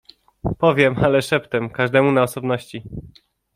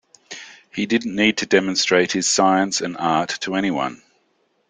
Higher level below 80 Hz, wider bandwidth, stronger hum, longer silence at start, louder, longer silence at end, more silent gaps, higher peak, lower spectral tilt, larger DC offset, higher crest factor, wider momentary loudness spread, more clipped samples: first, -44 dBFS vs -62 dBFS; first, 15.5 kHz vs 9.6 kHz; neither; first, 0.45 s vs 0.3 s; about the same, -19 LUFS vs -19 LUFS; second, 0.45 s vs 0.75 s; neither; about the same, -2 dBFS vs -2 dBFS; first, -6 dB/octave vs -3 dB/octave; neither; about the same, 18 dB vs 18 dB; about the same, 18 LU vs 17 LU; neither